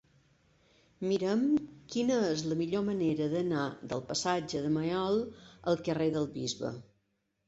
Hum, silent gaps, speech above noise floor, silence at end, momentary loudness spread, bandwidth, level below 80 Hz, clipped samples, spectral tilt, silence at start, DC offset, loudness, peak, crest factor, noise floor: none; none; 47 dB; 0.65 s; 9 LU; 8.2 kHz; -66 dBFS; under 0.1%; -5.5 dB/octave; 1 s; under 0.1%; -32 LUFS; -16 dBFS; 16 dB; -78 dBFS